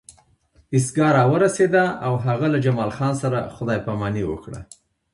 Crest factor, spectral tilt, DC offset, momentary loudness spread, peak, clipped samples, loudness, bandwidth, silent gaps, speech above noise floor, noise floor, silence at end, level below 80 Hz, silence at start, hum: 16 dB; -6.5 dB/octave; under 0.1%; 10 LU; -4 dBFS; under 0.1%; -21 LUFS; 11.5 kHz; none; 39 dB; -59 dBFS; 0.5 s; -50 dBFS; 0.1 s; none